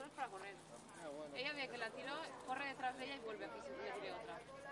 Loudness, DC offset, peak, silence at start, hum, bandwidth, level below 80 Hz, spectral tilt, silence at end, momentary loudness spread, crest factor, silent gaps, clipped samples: -48 LUFS; under 0.1%; -28 dBFS; 0 s; none; 11.5 kHz; -80 dBFS; -3 dB/octave; 0 s; 9 LU; 20 dB; none; under 0.1%